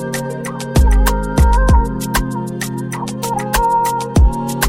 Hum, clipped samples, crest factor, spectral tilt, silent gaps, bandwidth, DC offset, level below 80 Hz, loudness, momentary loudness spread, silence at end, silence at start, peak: none; under 0.1%; 14 dB; -5.5 dB/octave; none; 17 kHz; under 0.1%; -16 dBFS; -16 LUFS; 9 LU; 0 s; 0 s; -2 dBFS